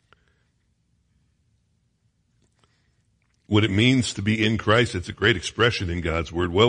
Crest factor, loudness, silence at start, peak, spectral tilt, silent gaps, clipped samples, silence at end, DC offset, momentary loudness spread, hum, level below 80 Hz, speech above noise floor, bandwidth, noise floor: 20 dB; -22 LUFS; 3.5 s; -4 dBFS; -5 dB/octave; none; under 0.1%; 0 s; under 0.1%; 7 LU; none; -48 dBFS; 47 dB; 10.5 kHz; -68 dBFS